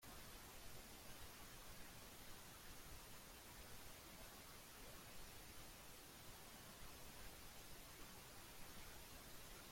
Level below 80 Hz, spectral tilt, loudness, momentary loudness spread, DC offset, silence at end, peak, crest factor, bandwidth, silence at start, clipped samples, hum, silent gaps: -66 dBFS; -2.5 dB/octave; -58 LUFS; 1 LU; under 0.1%; 0 s; -44 dBFS; 14 dB; 16.5 kHz; 0 s; under 0.1%; none; none